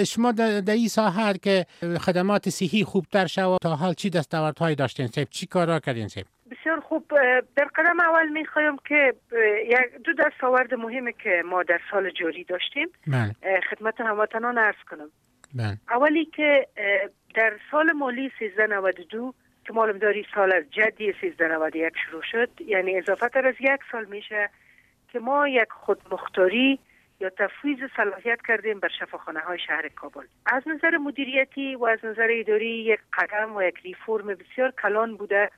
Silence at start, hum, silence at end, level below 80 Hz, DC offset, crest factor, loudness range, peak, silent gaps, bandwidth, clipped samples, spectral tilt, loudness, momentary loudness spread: 0 s; none; 0.1 s; -68 dBFS; under 0.1%; 18 dB; 4 LU; -6 dBFS; none; 15 kHz; under 0.1%; -5.5 dB/octave; -24 LUFS; 10 LU